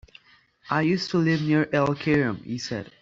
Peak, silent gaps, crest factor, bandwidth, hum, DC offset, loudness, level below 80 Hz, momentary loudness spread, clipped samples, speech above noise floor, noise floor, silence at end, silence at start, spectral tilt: -8 dBFS; none; 16 dB; 7.6 kHz; none; under 0.1%; -24 LUFS; -58 dBFS; 9 LU; under 0.1%; 35 dB; -58 dBFS; 0.15 s; 0.65 s; -6.5 dB/octave